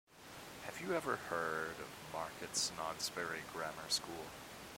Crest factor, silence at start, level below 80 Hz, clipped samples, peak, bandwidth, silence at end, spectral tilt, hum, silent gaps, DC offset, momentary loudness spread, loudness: 20 dB; 0.1 s; -70 dBFS; under 0.1%; -22 dBFS; 16.5 kHz; 0 s; -2 dB/octave; none; none; under 0.1%; 12 LU; -41 LUFS